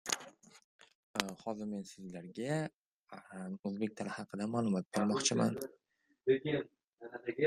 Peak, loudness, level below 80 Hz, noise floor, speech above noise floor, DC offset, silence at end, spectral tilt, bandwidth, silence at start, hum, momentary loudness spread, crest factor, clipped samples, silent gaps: -6 dBFS; -37 LUFS; -76 dBFS; -56 dBFS; 19 dB; under 0.1%; 0 s; -4.5 dB/octave; 15 kHz; 0.05 s; none; 18 LU; 32 dB; under 0.1%; 0.64-0.79 s, 0.95-1.14 s, 2.74-3.02 s, 3.59-3.63 s, 6.84-6.97 s